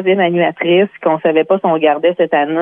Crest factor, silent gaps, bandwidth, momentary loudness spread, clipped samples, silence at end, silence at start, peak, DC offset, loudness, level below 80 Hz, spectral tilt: 12 dB; none; 3.7 kHz; 2 LU; under 0.1%; 0 s; 0 s; 0 dBFS; under 0.1%; -13 LUFS; -64 dBFS; -9 dB/octave